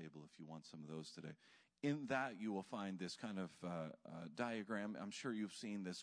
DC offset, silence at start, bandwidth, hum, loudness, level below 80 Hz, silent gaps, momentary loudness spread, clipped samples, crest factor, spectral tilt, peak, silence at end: under 0.1%; 0 s; 10.5 kHz; none; -47 LUFS; -88 dBFS; none; 13 LU; under 0.1%; 20 dB; -5.5 dB/octave; -26 dBFS; 0 s